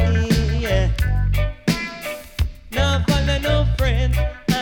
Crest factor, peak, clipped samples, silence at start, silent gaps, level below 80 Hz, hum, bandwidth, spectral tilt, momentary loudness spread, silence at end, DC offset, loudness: 12 dB; -6 dBFS; under 0.1%; 0 s; none; -22 dBFS; none; 18 kHz; -6 dB/octave; 8 LU; 0 s; under 0.1%; -21 LUFS